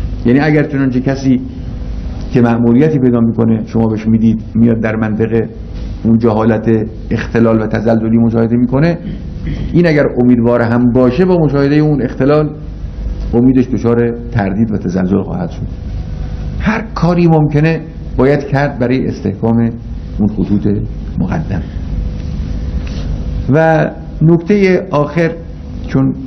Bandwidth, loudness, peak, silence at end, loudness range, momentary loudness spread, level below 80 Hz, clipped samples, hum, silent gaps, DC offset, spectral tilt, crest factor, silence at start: 6.4 kHz; -13 LUFS; 0 dBFS; 0 s; 5 LU; 13 LU; -26 dBFS; 0.4%; none; none; under 0.1%; -9 dB/octave; 12 dB; 0 s